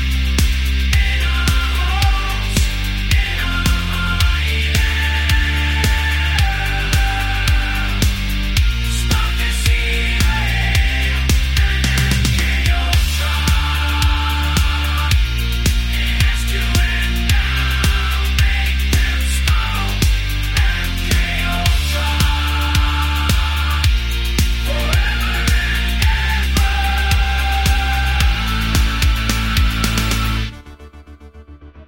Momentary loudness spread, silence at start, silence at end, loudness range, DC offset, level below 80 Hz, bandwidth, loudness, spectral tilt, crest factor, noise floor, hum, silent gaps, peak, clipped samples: 2 LU; 0 s; 0.05 s; 1 LU; under 0.1%; -18 dBFS; 17 kHz; -17 LUFS; -4 dB/octave; 16 dB; -38 dBFS; none; none; 0 dBFS; under 0.1%